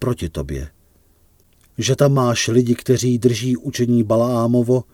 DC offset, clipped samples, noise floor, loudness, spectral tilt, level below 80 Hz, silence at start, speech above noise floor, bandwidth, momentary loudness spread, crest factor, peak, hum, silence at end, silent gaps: under 0.1%; under 0.1%; -55 dBFS; -18 LUFS; -6 dB/octave; -40 dBFS; 0 s; 38 dB; 17 kHz; 12 LU; 16 dB; -2 dBFS; none; 0.1 s; none